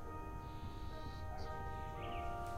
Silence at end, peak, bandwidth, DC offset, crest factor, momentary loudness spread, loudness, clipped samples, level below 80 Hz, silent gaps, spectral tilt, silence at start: 0 s; -30 dBFS; 16 kHz; under 0.1%; 14 dB; 5 LU; -47 LUFS; under 0.1%; -50 dBFS; none; -6.5 dB/octave; 0 s